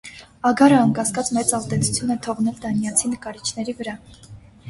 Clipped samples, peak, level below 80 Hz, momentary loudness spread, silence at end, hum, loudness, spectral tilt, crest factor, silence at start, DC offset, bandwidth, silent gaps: under 0.1%; -2 dBFS; -52 dBFS; 14 LU; 0 s; none; -20 LUFS; -4.5 dB/octave; 20 dB; 0.05 s; under 0.1%; 12 kHz; none